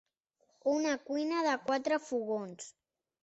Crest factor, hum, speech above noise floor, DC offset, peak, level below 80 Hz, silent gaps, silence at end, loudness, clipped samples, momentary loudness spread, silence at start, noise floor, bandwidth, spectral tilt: 16 dB; none; 43 dB; under 0.1%; -20 dBFS; -80 dBFS; none; 0.55 s; -33 LUFS; under 0.1%; 12 LU; 0.65 s; -76 dBFS; 8.2 kHz; -3.5 dB/octave